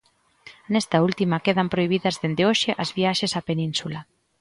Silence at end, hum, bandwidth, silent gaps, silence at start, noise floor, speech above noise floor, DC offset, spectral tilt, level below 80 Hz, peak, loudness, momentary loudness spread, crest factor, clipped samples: 0.4 s; none; 11.5 kHz; none; 0.45 s; -51 dBFS; 28 dB; under 0.1%; -5 dB/octave; -60 dBFS; -6 dBFS; -23 LUFS; 6 LU; 18 dB; under 0.1%